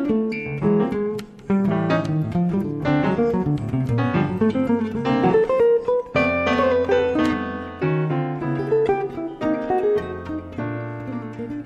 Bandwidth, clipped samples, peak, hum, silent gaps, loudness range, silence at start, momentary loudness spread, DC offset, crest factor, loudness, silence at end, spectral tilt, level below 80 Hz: 11.5 kHz; under 0.1%; -8 dBFS; none; none; 4 LU; 0 s; 11 LU; under 0.1%; 12 dB; -22 LUFS; 0 s; -8.5 dB/octave; -48 dBFS